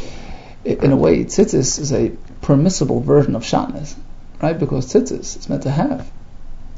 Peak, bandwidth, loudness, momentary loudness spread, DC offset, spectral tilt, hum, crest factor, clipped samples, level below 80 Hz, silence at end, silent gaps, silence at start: 0 dBFS; 8 kHz; -17 LUFS; 14 LU; under 0.1%; -6 dB/octave; none; 18 dB; under 0.1%; -32 dBFS; 0 s; none; 0 s